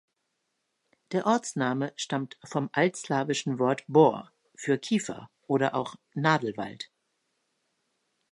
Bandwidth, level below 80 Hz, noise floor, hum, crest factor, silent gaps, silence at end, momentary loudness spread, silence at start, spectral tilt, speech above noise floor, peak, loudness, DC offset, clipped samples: 11.5 kHz; -76 dBFS; -79 dBFS; none; 22 dB; none; 1.45 s; 14 LU; 1.1 s; -5 dB/octave; 52 dB; -8 dBFS; -28 LUFS; under 0.1%; under 0.1%